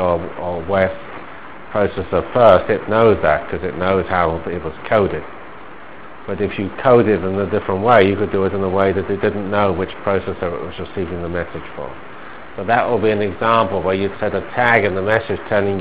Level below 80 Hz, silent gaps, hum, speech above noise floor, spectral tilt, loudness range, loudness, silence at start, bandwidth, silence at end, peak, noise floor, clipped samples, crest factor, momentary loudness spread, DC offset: -40 dBFS; none; none; 20 dB; -10 dB/octave; 6 LU; -17 LUFS; 0 s; 4 kHz; 0 s; 0 dBFS; -37 dBFS; under 0.1%; 18 dB; 19 LU; 2%